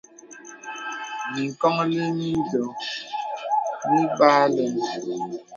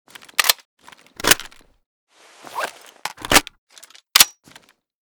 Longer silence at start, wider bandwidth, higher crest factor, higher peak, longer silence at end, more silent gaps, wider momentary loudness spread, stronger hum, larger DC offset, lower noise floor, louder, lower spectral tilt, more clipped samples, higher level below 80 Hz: second, 0.25 s vs 0.4 s; second, 7.6 kHz vs over 20 kHz; about the same, 22 dB vs 24 dB; about the same, -2 dBFS vs 0 dBFS; second, 0 s vs 0.8 s; second, none vs 0.65-0.77 s, 1.86-2.07 s, 3.58-3.67 s; second, 15 LU vs 19 LU; neither; neither; second, -44 dBFS vs -51 dBFS; second, -24 LUFS vs -17 LUFS; first, -5.5 dB/octave vs 0 dB/octave; neither; second, -66 dBFS vs -44 dBFS